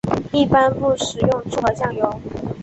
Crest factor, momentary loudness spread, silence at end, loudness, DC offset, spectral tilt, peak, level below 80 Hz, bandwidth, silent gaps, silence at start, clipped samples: 16 dB; 8 LU; 0 s; -19 LUFS; under 0.1%; -5.5 dB/octave; -2 dBFS; -42 dBFS; 8.4 kHz; none; 0.05 s; under 0.1%